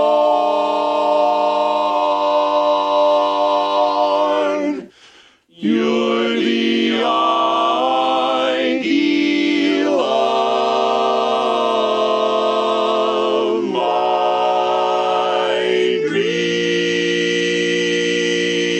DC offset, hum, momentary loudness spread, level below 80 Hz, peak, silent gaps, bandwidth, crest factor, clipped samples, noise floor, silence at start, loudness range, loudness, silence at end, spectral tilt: under 0.1%; none; 2 LU; -62 dBFS; -4 dBFS; none; 9.4 kHz; 12 dB; under 0.1%; -49 dBFS; 0 s; 2 LU; -17 LUFS; 0 s; -4 dB/octave